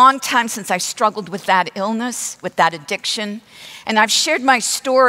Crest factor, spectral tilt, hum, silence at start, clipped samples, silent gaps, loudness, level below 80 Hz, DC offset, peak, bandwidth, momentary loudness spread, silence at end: 16 dB; -2 dB/octave; none; 0 s; under 0.1%; none; -17 LUFS; -68 dBFS; under 0.1%; -2 dBFS; 16 kHz; 11 LU; 0 s